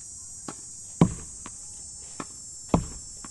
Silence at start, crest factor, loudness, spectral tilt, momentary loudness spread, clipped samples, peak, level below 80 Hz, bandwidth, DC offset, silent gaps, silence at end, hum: 0 s; 26 dB; -31 LUFS; -5.5 dB/octave; 13 LU; under 0.1%; -4 dBFS; -44 dBFS; 12 kHz; under 0.1%; none; 0 s; none